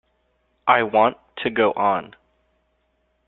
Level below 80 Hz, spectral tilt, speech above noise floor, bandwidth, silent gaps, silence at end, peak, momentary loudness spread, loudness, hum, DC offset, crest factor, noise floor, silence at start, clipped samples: -62 dBFS; -8.5 dB/octave; 49 dB; 4.2 kHz; none; 1.2 s; -2 dBFS; 9 LU; -20 LUFS; none; under 0.1%; 20 dB; -68 dBFS; 0.65 s; under 0.1%